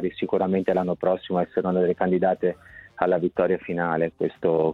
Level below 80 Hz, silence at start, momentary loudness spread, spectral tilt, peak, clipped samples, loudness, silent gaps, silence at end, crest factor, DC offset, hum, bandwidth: -58 dBFS; 0 s; 4 LU; -9.5 dB/octave; -6 dBFS; under 0.1%; -24 LUFS; none; 0 s; 18 dB; under 0.1%; none; 4.3 kHz